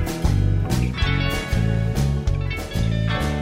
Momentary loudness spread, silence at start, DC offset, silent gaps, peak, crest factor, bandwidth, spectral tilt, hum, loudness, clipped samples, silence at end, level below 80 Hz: 4 LU; 0 s; under 0.1%; none; -8 dBFS; 12 dB; 16 kHz; -6 dB/octave; none; -22 LUFS; under 0.1%; 0 s; -26 dBFS